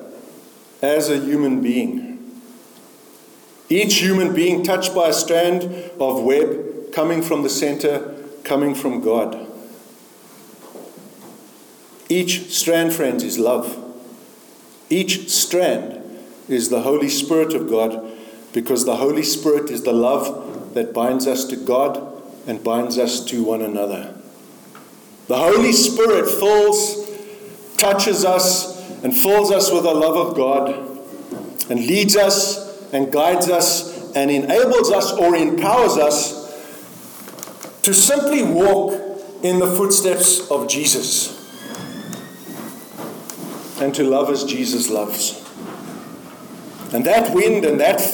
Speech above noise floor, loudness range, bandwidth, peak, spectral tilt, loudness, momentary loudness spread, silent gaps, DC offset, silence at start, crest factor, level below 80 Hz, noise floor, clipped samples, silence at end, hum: 29 dB; 7 LU; 19.5 kHz; 0 dBFS; -3 dB/octave; -17 LUFS; 19 LU; none; under 0.1%; 0 s; 18 dB; -60 dBFS; -46 dBFS; under 0.1%; 0 s; none